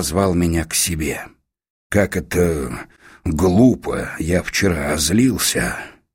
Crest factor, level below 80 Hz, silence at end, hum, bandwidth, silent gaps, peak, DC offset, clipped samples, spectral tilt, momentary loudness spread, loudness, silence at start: 18 dB; -34 dBFS; 0.25 s; none; 16.5 kHz; 1.70-1.90 s; -2 dBFS; under 0.1%; under 0.1%; -4.5 dB/octave; 10 LU; -18 LUFS; 0 s